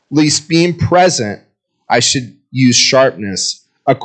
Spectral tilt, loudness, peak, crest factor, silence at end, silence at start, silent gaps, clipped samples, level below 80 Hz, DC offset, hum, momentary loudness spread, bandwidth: -3.5 dB/octave; -12 LUFS; 0 dBFS; 14 dB; 0 s; 0.1 s; none; under 0.1%; -48 dBFS; under 0.1%; none; 11 LU; 9.4 kHz